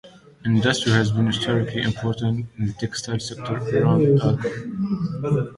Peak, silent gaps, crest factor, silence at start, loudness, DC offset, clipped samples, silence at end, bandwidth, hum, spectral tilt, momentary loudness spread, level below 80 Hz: -4 dBFS; none; 18 dB; 0.05 s; -22 LUFS; under 0.1%; under 0.1%; 0 s; 11.5 kHz; none; -6 dB/octave; 10 LU; -50 dBFS